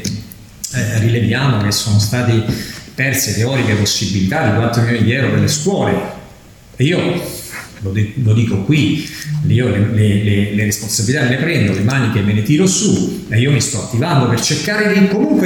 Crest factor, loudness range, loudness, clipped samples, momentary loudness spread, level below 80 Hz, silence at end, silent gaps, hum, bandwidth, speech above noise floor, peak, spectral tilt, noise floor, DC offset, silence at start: 14 dB; 3 LU; -15 LUFS; under 0.1%; 9 LU; -42 dBFS; 0 s; none; none; 17.5 kHz; 26 dB; 0 dBFS; -5 dB/octave; -40 dBFS; under 0.1%; 0 s